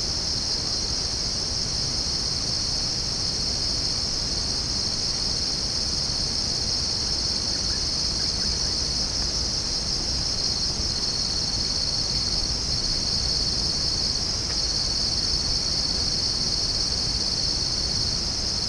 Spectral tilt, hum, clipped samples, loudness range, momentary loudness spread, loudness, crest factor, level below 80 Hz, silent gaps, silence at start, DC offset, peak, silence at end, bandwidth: -2 dB/octave; none; under 0.1%; 1 LU; 2 LU; -23 LUFS; 14 dB; -36 dBFS; none; 0 s; under 0.1%; -10 dBFS; 0 s; 10.5 kHz